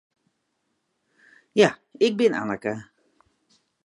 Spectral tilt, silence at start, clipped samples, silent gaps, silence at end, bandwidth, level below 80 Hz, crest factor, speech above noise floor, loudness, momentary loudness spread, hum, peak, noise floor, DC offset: -5 dB/octave; 1.55 s; under 0.1%; none; 1.05 s; 11.5 kHz; -70 dBFS; 22 dB; 53 dB; -23 LUFS; 10 LU; none; -4 dBFS; -75 dBFS; under 0.1%